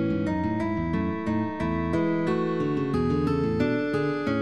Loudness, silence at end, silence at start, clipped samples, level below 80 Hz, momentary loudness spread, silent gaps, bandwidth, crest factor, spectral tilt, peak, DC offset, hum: -26 LUFS; 0 s; 0 s; under 0.1%; -46 dBFS; 3 LU; none; 9.4 kHz; 14 dB; -8.5 dB/octave; -12 dBFS; 0.4%; none